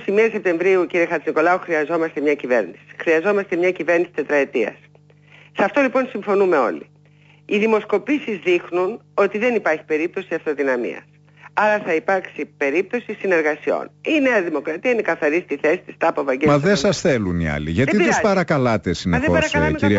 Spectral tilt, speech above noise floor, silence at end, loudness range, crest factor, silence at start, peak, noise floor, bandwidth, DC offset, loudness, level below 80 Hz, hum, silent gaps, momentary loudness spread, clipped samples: -6 dB/octave; 32 dB; 0 s; 3 LU; 14 dB; 0 s; -6 dBFS; -51 dBFS; 8 kHz; under 0.1%; -19 LUFS; -46 dBFS; 50 Hz at -50 dBFS; none; 7 LU; under 0.1%